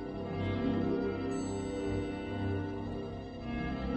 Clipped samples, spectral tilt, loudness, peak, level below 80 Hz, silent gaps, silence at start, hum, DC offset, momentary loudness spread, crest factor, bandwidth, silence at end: under 0.1%; -7 dB/octave; -36 LUFS; -20 dBFS; -48 dBFS; none; 0 s; none; under 0.1%; 7 LU; 14 dB; 8.4 kHz; 0 s